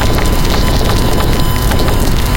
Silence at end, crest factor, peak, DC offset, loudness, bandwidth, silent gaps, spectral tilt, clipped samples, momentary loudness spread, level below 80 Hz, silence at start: 0 s; 10 dB; 0 dBFS; under 0.1%; -13 LUFS; 17.5 kHz; none; -5 dB/octave; under 0.1%; 1 LU; -14 dBFS; 0 s